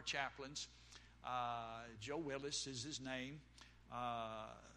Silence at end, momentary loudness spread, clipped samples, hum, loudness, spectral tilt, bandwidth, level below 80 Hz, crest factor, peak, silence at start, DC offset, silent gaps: 0 s; 13 LU; under 0.1%; 60 Hz at -65 dBFS; -47 LUFS; -3 dB/octave; 12.5 kHz; -70 dBFS; 20 dB; -28 dBFS; 0 s; under 0.1%; none